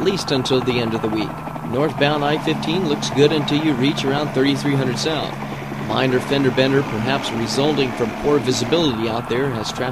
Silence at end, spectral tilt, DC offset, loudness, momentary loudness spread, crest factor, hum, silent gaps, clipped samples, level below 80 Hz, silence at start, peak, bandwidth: 0 s; -5.5 dB/octave; 0.3%; -19 LUFS; 6 LU; 16 dB; none; none; under 0.1%; -46 dBFS; 0 s; -2 dBFS; 15.5 kHz